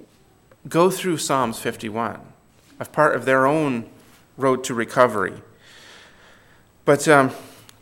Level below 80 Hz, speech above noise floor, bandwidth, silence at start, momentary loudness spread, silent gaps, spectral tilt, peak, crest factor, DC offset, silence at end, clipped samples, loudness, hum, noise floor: -62 dBFS; 35 dB; 17.5 kHz; 0.65 s; 12 LU; none; -5 dB/octave; 0 dBFS; 22 dB; under 0.1%; 0.3 s; under 0.1%; -20 LUFS; none; -54 dBFS